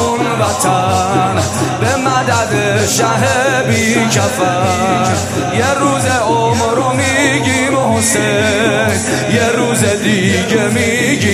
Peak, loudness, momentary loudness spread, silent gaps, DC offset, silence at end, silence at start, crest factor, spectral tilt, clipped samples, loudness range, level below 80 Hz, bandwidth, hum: 0 dBFS; -12 LUFS; 3 LU; none; under 0.1%; 0 s; 0 s; 12 dB; -4 dB/octave; under 0.1%; 1 LU; -44 dBFS; 15.5 kHz; none